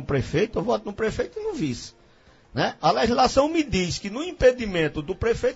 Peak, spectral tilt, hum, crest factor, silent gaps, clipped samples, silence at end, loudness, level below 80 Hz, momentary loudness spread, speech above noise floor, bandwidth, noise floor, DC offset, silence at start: -4 dBFS; -5 dB/octave; none; 20 dB; none; under 0.1%; 0 s; -24 LUFS; -42 dBFS; 10 LU; 31 dB; 8 kHz; -55 dBFS; under 0.1%; 0 s